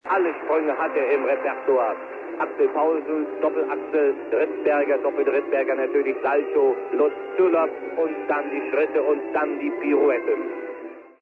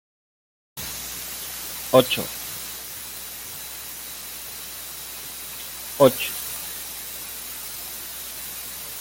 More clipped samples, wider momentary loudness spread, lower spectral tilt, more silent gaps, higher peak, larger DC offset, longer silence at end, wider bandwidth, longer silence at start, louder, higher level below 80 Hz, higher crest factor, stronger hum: neither; second, 6 LU vs 14 LU; first, -7 dB/octave vs -3 dB/octave; neither; second, -8 dBFS vs -2 dBFS; neither; first, 0.15 s vs 0 s; second, 4.2 kHz vs 17 kHz; second, 0.05 s vs 0.75 s; first, -23 LUFS vs -27 LUFS; second, -72 dBFS vs -54 dBFS; second, 14 dB vs 26 dB; neither